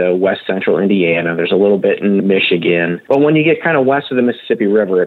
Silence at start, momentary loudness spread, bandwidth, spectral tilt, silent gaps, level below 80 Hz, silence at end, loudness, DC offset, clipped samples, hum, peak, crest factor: 0 s; 4 LU; 4.4 kHz; -8.5 dB/octave; none; -72 dBFS; 0 s; -13 LUFS; under 0.1%; under 0.1%; none; -2 dBFS; 10 dB